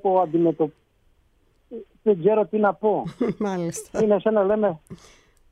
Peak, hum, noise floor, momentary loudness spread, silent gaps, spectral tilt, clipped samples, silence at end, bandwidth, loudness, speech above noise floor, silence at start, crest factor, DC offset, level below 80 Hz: -8 dBFS; none; -62 dBFS; 9 LU; none; -7 dB/octave; under 0.1%; 0.55 s; 13 kHz; -22 LUFS; 40 dB; 0.05 s; 16 dB; under 0.1%; -58 dBFS